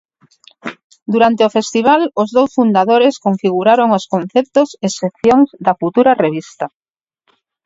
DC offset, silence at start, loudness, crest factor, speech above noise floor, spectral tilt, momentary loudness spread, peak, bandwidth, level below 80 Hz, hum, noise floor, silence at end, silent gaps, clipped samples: under 0.1%; 0.65 s; -13 LUFS; 14 dB; 50 dB; -5.5 dB/octave; 15 LU; 0 dBFS; 8 kHz; -56 dBFS; none; -63 dBFS; 1 s; 0.84-0.90 s, 1.02-1.06 s; under 0.1%